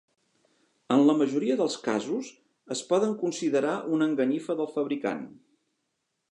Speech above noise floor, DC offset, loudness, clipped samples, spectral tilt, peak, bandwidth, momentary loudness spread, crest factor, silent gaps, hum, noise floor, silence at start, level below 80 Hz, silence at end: 53 dB; under 0.1%; -27 LUFS; under 0.1%; -5 dB/octave; -10 dBFS; 11 kHz; 12 LU; 18 dB; none; none; -79 dBFS; 0.9 s; -80 dBFS; 1 s